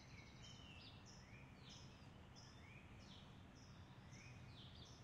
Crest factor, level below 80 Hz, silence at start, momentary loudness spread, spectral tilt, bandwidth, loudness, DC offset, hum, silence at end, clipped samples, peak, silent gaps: 12 dB; -72 dBFS; 0 s; 3 LU; -4.5 dB/octave; 11 kHz; -61 LUFS; under 0.1%; none; 0 s; under 0.1%; -48 dBFS; none